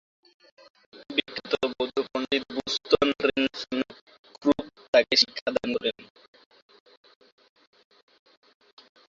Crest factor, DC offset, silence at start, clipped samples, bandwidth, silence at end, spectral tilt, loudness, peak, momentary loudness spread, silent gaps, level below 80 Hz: 24 dB; under 0.1%; 0.95 s; under 0.1%; 7.8 kHz; 3.05 s; -3 dB/octave; -26 LUFS; -6 dBFS; 10 LU; 4.01-4.07 s, 4.19-4.24 s, 4.88-4.93 s, 5.41-5.46 s; -62 dBFS